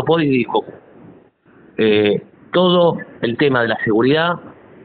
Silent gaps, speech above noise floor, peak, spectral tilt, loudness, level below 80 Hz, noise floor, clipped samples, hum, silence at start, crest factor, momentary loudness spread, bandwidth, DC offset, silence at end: none; 33 dB; -2 dBFS; -4 dB/octave; -16 LUFS; -58 dBFS; -49 dBFS; under 0.1%; none; 0 s; 14 dB; 9 LU; 4.6 kHz; under 0.1%; 0.35 s